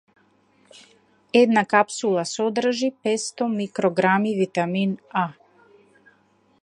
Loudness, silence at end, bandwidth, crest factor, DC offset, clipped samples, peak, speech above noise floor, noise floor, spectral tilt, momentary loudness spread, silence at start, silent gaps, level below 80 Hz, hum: -22 LUFS; 1.3 s; 11 kHz; 22 dB; under 0.1%; under 0.1%; -2 dBFS; 40 dB; -61 dBFS; -5 dB/octave; 8 LU; 1.35 s; none; -74 dBFS; none